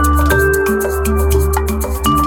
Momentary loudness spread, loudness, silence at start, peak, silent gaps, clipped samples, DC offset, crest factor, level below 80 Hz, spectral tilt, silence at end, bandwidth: 5 LU; -14 LUFS; 0 s; 0 dBFS; none; under 0.1%; under 0.1%; 14 dB; -18 dBFS; -5.5 dB/octave; 0 s; 19 kHz